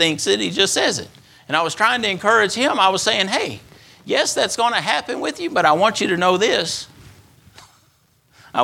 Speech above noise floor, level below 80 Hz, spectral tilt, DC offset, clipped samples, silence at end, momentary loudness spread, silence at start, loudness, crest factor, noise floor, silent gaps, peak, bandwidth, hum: 40 dB; -60 dBFS; -2.5 dB/octave; under 0.1%; under 0.1%; 0 s; 10 LU; 0 s; -18 LUFS; 18 dB; -59 dBFS; none; 0 dBFS; 17 kHz; none